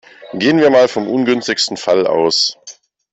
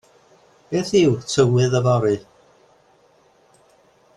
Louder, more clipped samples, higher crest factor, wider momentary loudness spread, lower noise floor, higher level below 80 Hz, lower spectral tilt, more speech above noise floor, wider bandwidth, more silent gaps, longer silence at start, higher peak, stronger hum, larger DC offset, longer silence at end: first, -14 LUFS vs -19 LUFS; neither; second, 12 dB vs 18 dB; about the same, 7 LU vs 9 LU; second, -40 dBFS vs -56 dBFS; about the same, -58 dBFS vs -56 dBFS; second, -3.5 dB/octave vs -6 dB/octave; second, 27 dB vs 39 dB; second, 8.4 kHz vs 11 kHz; neither; second, 0.2 s vs 0.7 s; about the same, -2 dBFS vs -4 dBFS; neither; neither; second, 0.4 s vs 1.95 s